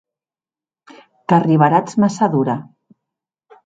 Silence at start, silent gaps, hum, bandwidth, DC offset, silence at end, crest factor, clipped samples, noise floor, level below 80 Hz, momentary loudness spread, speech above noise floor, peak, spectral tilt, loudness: 1.3 s; none; none; 9.2 kHz; under 0.1%; 1.05 s; 18 dB; under 0.1%; under -90 dBFS; -62 dBFS; 11 LU; over 75 dB; 0 dBFS; -7.5 dB/octave; -16 LUFS